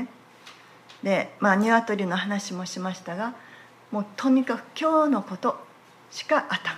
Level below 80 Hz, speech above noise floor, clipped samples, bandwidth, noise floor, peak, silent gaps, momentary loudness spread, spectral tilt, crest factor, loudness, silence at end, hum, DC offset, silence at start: -78 dBFS; 25 dB; under 0.1%; 13 kHz; -50 dBFS; -8 dBFS; none; 12 LU; -5 dB/octave; 18 dB; -25 LUFS; 0 s; none; under 0.1%; 0 s